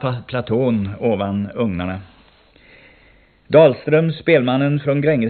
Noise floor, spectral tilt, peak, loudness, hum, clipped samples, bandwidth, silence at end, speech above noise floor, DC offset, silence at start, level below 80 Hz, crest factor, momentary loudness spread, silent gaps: -52 dBFS; -6.5 dB/octave; 0 dBFS; -17 LUFS; none; under 0.1%; 4.5 kHz; 0 s; 35 dB; under 0.1%; 0 s; -50 dBFS; 18 dB; 11 LU; none